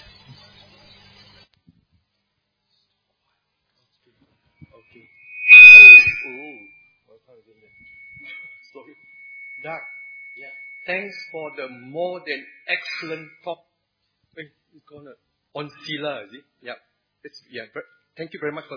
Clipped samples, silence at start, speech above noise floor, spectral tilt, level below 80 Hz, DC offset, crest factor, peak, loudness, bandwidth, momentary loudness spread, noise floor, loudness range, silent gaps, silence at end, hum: 0.2%; 5.45 s; 41 dB; -2.5 dB/octave; -62 dBFS; under 0.1%; 18 dB; 0 dBFS; -4 LUFS; 5.4 kHz; 34 LU; -74 dBFS; 26 LU; none; 0.25 s; none